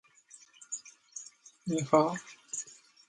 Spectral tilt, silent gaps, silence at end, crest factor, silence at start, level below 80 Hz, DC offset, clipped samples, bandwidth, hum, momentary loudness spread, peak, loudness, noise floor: -5 dB/octave; none; 0.4 s; 26 dB; 0.6 s; -76 dBFS; under 0.1%; under 0.1%; 11.5 kHz; none; 22 LU; -8 dBFS; -32 LUFS; -59 dBFS